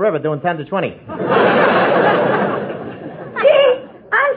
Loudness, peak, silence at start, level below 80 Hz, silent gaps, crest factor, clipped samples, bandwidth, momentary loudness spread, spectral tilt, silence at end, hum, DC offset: -15 LUFS; 0 dBFS; 0 s; -58 dBFS; none; 14 dB; under 0.1%; 4.9 kHz; 14 LU; -9 dB/octave; 0 s; none; under 0.1%